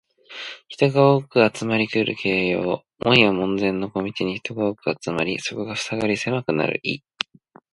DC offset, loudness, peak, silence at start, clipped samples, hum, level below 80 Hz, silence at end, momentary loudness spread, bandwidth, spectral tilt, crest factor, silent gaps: under 0.1%; -22 LUFS; 0 dBFS; 0.3 s; under 0.1%; none; -56 dBFS; 0.75 s; 13 LU; 11.5 kHz; -5.5 dB/octave; 22 dB; none